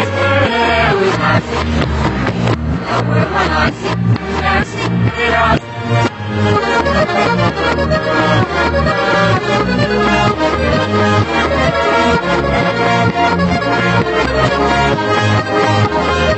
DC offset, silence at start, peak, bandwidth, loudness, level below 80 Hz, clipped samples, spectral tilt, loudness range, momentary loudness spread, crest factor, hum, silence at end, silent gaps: under 0.1%; 0 s; 0 dBFS; 8.4 kHz; -13 LUFS; -28 dBFS; under 0.1%; -6 dB/octave; 2 LU; 4 LU; 12 dB; none; 0 s; none